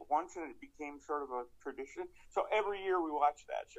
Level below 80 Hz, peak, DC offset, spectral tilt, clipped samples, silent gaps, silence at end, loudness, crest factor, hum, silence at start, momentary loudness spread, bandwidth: -68 dBFS; -18 dBFS; under 0.1%; -3.5 dB/octave; under 0.1%; none; 0 s; -38 LUFS; 20 dB; none; 0 s; 13 LU; 9.6 kHz